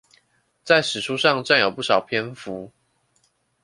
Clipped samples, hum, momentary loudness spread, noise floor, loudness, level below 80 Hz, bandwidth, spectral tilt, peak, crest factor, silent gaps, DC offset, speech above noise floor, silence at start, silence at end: under 0.1%; none; 16 LU; -66 dBFS; -20 LUFS; -66 dBFS; 11.5 kHz; -3.5 dB/octave; -2 dBFS; 22 dB; none; under 0.1%; 45 dB; 0.65 s; 0.95 s